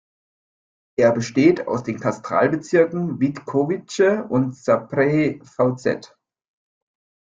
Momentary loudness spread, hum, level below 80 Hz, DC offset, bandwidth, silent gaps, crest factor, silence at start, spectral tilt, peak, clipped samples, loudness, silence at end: 8 LU; none; -62 dBFS; under 0.1%; 9.2 kHz; none; 18 dB; 1 s; -7 dB/octave; -2 dBFS; under 0.1%; -20 LUFS; 1.3 s